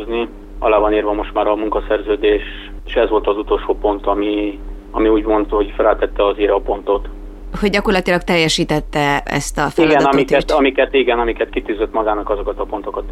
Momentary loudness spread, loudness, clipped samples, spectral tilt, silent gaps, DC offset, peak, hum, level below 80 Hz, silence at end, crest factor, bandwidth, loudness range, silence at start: 9 LU; -16 LUFS; under 0.1%; -5 dB/octave; none; under 0.1%; 0 dBFS; none; -30 dBFS; 0 s; 16 dB; 13.5 kHz; 3 LU; 0 s